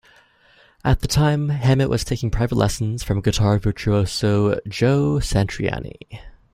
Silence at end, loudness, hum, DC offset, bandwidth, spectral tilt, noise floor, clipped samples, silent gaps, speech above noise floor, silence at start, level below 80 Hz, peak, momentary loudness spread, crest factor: 0.25 s; -20 LUFS; none; under 0.1%; 15.5 kHz; -6 dB/octave; -54 dBFS; under 0.1%; none; 35 dB; 0.85 s; -32 dBFS; -2 dBFS; 8 LU; 18 dB